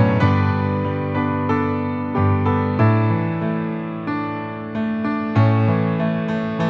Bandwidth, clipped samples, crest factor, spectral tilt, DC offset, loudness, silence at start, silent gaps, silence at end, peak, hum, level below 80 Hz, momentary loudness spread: 5.6 kHz; under 0.1%; 16 dB; -9.5 dB/octave; under 0.1%; -20 LUFS; 0 s; none; 0 s; -4 dBFS; none; -54 dBFS; 8 LU